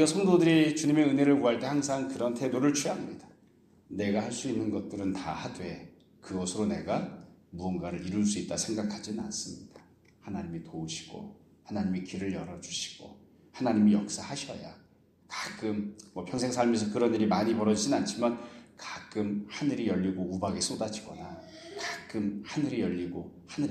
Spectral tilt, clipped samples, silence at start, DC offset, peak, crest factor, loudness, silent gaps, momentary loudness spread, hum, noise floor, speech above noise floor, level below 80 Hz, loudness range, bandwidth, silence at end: -5 dB/octave; under 0.1%; 0 s; under 0.1%; -12 dBFS; 18 dB; -31 LUFS; none; 18 LU; none; -62 dBFS; 32 dB; -64 dBFS; 8 LU; 13 kHz; 0 s